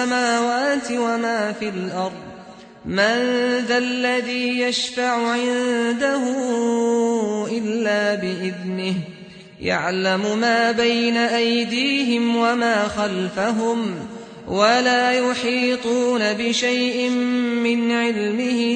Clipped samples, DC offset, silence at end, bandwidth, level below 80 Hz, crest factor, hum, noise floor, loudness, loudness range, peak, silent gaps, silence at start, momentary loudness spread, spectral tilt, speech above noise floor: under 0.1%; under 0.1%; 0 s; 9.4 kHz; -58 dBFS; 16 dB; none; -41 dBFS; -20 LUFS; 3 LU; -6 dBFS; none; 0 s; 8 LU; -4 dB/octave; 21 dB